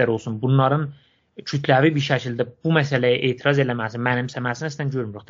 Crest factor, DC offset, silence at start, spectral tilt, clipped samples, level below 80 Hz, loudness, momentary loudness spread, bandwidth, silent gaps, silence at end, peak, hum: 20 dB; under 0.1%; 0 s; -5 dB/octave; under 0.1%; -62 dBFS; -21 LUFS; 9 LU; 7.6 kHz; none; 0.1 s; -2 dBFS; none